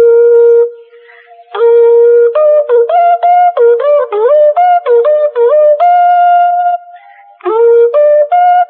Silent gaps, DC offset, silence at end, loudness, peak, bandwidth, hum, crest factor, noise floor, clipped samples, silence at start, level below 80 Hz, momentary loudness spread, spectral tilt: none; under 0.1%; 0 s; -7 LUFS; 0 dBFS; 3.8 kHz; none; 6 dB; -38 dBFS; under 0.1%; 0 s; -80 dBFS; 6 LU; -4 dB/octave